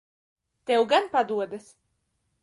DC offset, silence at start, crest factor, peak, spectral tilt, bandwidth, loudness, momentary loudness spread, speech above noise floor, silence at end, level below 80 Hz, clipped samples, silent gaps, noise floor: under 0.1%; 0.7 s; 20 dB; -8 dBFS; -4 dB/octave; 11.5 kHz; -25 LUFS; 18 LU; 50 dB; 0.85 s; -74 dBFS; under 0.1%; none; -75 dBFS